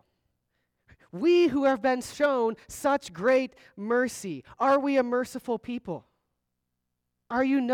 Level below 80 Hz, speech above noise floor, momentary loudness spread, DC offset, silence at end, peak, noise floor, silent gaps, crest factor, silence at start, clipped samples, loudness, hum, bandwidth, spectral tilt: -64 dBFS; 56 dB; 14 LU; under 0.1%; 0 s; -14 dBFS; -82 dBFS; none; 14 dB; 1.15 s; under 0.1%; -26 LUFS; none; 16 kHz; -5 dB/octave